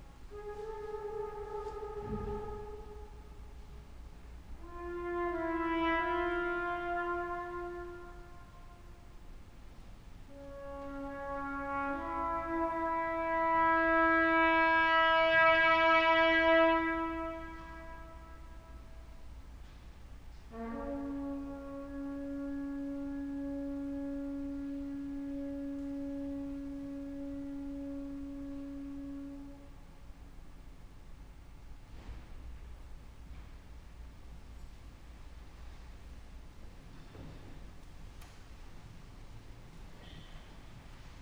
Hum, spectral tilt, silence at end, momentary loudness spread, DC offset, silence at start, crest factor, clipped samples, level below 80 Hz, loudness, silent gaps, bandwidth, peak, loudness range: none; -5.5 dB/octave; 0 s; 28 LU; under 0.1%; 0 s; 22 dB; under 0.1%; -52 dBFS; -33 LUFS; none; over 20 kHz; -16 dBFS; 26 LU